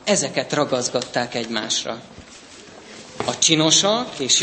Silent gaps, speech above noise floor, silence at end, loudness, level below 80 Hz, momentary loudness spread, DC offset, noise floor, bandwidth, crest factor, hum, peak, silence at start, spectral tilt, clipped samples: none; 22 dB; 0 s; -19 LUFS; -60 dBFS; 22 LU; under 0.1%; -43 dBFS; 8.8 kHz; 20 dB; none; -2 dBFS; 0 s; -2 dB/octave; under 0.1%